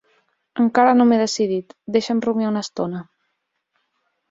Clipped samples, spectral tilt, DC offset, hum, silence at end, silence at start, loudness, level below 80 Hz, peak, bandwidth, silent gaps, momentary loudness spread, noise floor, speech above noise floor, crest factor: under 0.1%; -5 dB/octave; under 0.1%; none; 1.3 s; 0.55 s; -19 LUFS; -64 dBFS; -2 dBFS; 7.8 kHz; none; 13 LU; -74 dBFS; 56 dB; 18 dB